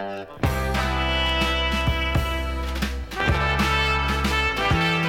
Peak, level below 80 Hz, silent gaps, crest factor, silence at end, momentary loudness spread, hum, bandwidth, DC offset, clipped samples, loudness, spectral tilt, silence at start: -8 dBFS; -28 dBFS; none; 14 dB; 0 s; 7 LU; none; 16.5 kHz; under 0.1%; under 0.1%; -23 LUFS; -5 dB/octave; 0 s